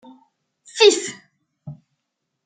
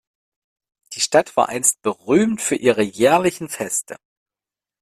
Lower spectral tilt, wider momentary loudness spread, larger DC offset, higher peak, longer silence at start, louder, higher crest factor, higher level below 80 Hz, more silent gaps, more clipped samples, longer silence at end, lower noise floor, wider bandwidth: second, -2 dB/octave vs -3.5 dB/octave; first, 26 LU vs 9 LU; neither; about the same, -2 dBFS vs 0 dBFS; second, 0.75 s vs 0.9 s; about the same, -16 LUFS vs -18 LUFS; about the same, 22 dB vs 20 dB; second, -72 dBFS vs -60 dBFS; neither; neither; second, 0.7 s vs 0.85 s; second, -78 dBFS vs -90 dBFS; second, 9.4 kHz vs 15.5 kHz